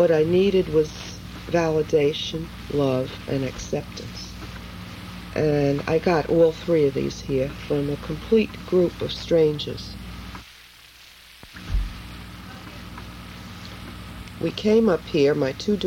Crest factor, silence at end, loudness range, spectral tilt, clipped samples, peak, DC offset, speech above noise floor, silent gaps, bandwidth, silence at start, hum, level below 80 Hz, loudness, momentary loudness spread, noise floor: 16 dB; 0 s; 14 LU; -6.5 dB/octave; under 0.1%; -8 dBFS; under 0.1%; 26 dB; none; 16.5 kHz; 0 s; none; -40 dBFS; -23 LUFS; 19 LU; -48 dBFS